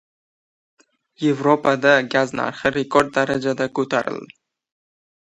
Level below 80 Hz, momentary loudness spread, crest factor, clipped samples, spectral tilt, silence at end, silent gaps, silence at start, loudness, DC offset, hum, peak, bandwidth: -58 dBFS; 7 LU; 20 dB; under 0.1%; -5.5 dB/octave; 0.95 s; none; 1.2 s; -19 LUFS; under 0.1%; none; 0 dBFS; 11.5 kHz